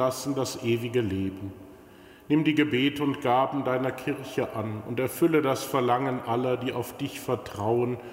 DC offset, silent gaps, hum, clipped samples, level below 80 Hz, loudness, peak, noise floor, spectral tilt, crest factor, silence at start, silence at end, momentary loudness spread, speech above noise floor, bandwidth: under 0.1%; none; none; under 0.1%; -62 dBFS; -27 LUFS; -10 dBFS; -50 dBFS; -5.5 dB/octave; 18 dB; 0 s; 0 s; 9 LU; 24 dB; 16 kHz